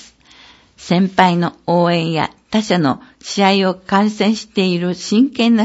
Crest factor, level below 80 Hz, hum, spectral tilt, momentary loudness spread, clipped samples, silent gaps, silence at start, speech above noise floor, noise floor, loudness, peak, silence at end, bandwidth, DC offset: 16 dB; -56 dBFS; none; -5.5 dB/octave; 6 LU; under 0.1%; none; 0.8 s; 30 dB; -45 dBFS; -16 LUFS; 0 dBFS; 0 s; 8 kHz; under 0.1%